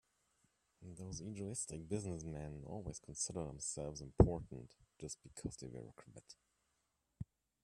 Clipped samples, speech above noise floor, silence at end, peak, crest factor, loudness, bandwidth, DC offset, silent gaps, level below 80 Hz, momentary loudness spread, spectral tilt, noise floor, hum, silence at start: under 0.1%; 42 dB; 0.4 s; -12 dBFS; 32 dB; -42 LUFS; 12.5 kHz; under 0.1%; none; -52 dBFS; 24 LU; -6 dB/octave; -84 dBFS; none; 0.8 s